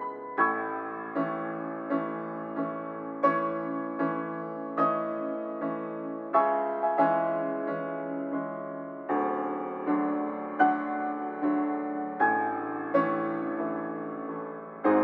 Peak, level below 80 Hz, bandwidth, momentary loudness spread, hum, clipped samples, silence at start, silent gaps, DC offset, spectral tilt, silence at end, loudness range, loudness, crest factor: -10 dBFS; -80 dBFS; 4.8 kHz; 10 LU; none; under 0.1%; 0 s; none; under 0.1%; -9.5 dB/octave; 0 s; 3 LU; -30 LUFS; 20 dB